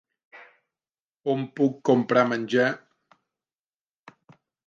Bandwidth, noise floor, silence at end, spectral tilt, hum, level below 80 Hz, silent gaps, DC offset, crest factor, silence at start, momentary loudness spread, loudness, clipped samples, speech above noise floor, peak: 7.4 kHz; under -90 dBFS; 1.9 s; -6.5 dB/octave; none; -78 dBFS; 1.00-1.10 s; under 0.1%; 22 dB; 0.35 s; 9 LU; -24 LUFS; under 0.1%; over 67 dB; -6 dBFS